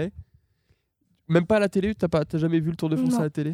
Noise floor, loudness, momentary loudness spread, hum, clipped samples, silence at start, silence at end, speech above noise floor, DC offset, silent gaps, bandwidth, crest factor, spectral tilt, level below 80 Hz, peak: -70 dBFS; -24 LUFS; 4 LU; none; under 0.1%; 0 s; 0 s; 47 dB; under 0.1%; none; 14.5 kHz; 18 dB; -7.5 dB/octave; -52 dBFS; -6 dBFS